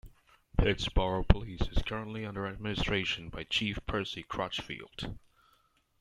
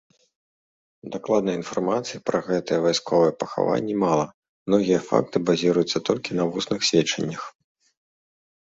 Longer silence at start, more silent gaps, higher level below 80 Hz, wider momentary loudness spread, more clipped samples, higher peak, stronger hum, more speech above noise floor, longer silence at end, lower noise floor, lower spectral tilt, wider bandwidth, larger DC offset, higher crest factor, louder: second, 0.05 s vs 1.05 s; second, none vs 4.34-4.43 s, 4.49-4.66 s; first, -38 dBFS vs -62 dBFS; about the same, 11 LU vs 10 LU; neither; about the same, -2 dBFS vs -2 dBFS; neither; second, 38 dB vs over 67 dB; second, 0.85 s vs 1.25 s; second, -70 dBFS vs under -90 dBFS; about the same, -5.5 dB/octave vs -5 dB/octave; first, 11.5 kHz vs 8 kHz; neither; first, 30 dB vs 22 dB; second, -33 LUFS vs -23 LUFS